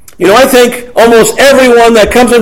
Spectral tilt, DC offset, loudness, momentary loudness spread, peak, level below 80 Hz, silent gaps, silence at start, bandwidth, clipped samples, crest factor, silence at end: -3 dB/octave; under 0.1%; -4 LUFS; 3 LU; 0 dBFS; -30 dBFS; none; 0.2 s; 18 kHz; 10%; 4 dB; 0 s